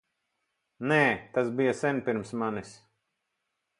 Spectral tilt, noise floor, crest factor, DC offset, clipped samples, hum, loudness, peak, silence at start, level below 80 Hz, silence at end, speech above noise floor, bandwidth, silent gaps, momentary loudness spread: -6 dB/octave; -82 dBFS; 22 dB; under 0.1%; under 0.1%; none; -28 LUFS; -8 dBFS; 0.8 s; -68 dBFS; 1.05 s; 54 dB; 11.5 kHz; none; 9 LU